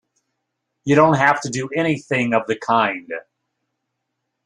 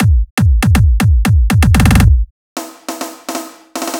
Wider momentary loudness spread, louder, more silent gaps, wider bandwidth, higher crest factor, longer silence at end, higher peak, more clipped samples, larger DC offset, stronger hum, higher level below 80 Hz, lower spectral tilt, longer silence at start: about the same, 15 LU vs 16 LU; second, -18 LUFS vs -11 LUFS; second, none vs 0.31-0.37 s, 2.31-2.56 s; second, 10.5 kHz vs 18 kHz; first, 20 dB vs 12 dB; first, 1.25 s vs 0 s; about the same, -2 dBFS vs 0 dBFS; second, under 0.1% vs 0.1%; neither; neither; second, -60 dBFS vs -14 dBFS; about the same, -5.5 dB/octave vs -6 dB/octave; first, 0.85 s vs 0 s